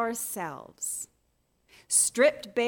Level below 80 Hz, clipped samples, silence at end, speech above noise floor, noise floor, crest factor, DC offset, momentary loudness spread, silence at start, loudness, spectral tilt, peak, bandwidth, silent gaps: -72 dBFS; under 0.1%; 0 s; 44 dB; -72 dBFS; 20 dB; under 0.1%; 14 LU; 0 s; -26 LUFS; -1.5 dB/octave; -10 dBFS; 18 kHz; none